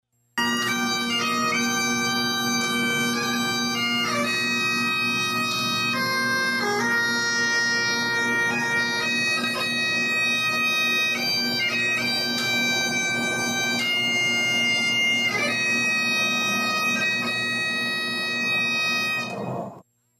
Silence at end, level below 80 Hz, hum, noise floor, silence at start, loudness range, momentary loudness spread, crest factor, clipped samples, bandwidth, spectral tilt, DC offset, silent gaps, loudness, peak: 0.4 s; -66 dBFS; none; -48 dBFS; 0.35 s; 2 LU; 3 LU; 10 dB; under 0.1%; 15.5 kHz; -2 dB/octave; under 0.1%; none; -22 LUFS; -14 dBFS